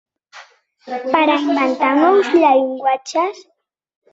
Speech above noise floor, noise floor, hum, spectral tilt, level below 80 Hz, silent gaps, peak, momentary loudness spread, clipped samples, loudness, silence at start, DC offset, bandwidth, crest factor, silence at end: 29 dB; -44 dBFS; none; -3.5 dB/octave; -66 dBFS; none; 0 dBFS; 9 LU; under 0.1%; -15 LUFS; 0.35 s; under 0.1%; 8 kHz; 16 dB; 0.7 s